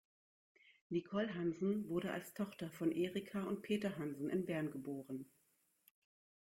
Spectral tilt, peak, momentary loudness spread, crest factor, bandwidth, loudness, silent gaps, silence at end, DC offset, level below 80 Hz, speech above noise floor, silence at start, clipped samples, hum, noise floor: -6.5 dB/octave; -26 dBFS; 8 LU; 16 dB; 16.5 kHz; -42 LUFS; none; 1.25 s; under 0.1%; -78 dBFS; 38 dB; 0.9 s; under 0.1%; none; -79 dBFS